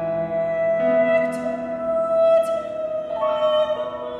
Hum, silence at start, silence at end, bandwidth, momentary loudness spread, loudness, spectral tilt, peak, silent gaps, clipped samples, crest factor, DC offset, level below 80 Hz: none; 0 s; 0 s; 11 kHz; 9 LU; -21 LUFS; -6 dB/octave; -8 dBFS; none; under 0.1%; 12 dB; under 0.1%; -56 dBFS